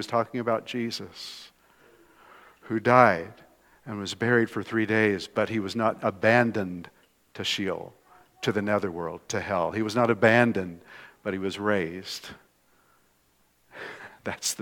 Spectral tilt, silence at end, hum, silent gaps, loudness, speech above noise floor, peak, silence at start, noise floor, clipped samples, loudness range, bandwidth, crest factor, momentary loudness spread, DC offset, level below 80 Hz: -5 dB/octave; 0 s; none; none; -26 LUFS; 40 dB; -4 dBFS; 0 s; -66 dBFS; under 0.1%; 7 LU; 18 kHz; 24 dB; 19 LU; under 0.1%; -68 dBFS